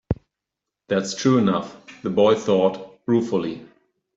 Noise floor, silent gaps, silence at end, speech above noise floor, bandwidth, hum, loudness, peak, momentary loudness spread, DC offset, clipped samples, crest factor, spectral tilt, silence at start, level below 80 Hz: -84 dBFS; none; 0.5 s; 64 dB; 7.8 kHz; none; -21 LUFS; -6 dBFS; 14 LU; under 0.1%; under 0.1%; 16 dB; -6 dB/octave; 0.1 s; -48 dBFS